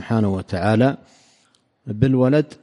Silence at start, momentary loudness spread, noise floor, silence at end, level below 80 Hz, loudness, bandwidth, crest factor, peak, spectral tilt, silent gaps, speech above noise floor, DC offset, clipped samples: 0 s; 17 LU; -61 dBFS; 0.1 s; -50 dBFS; -19 LUFS; 11 kHz; 16 dB; -4 dBFS; -8.5 dB/octave; none; 43 dB; under 0.1%; under 0.1%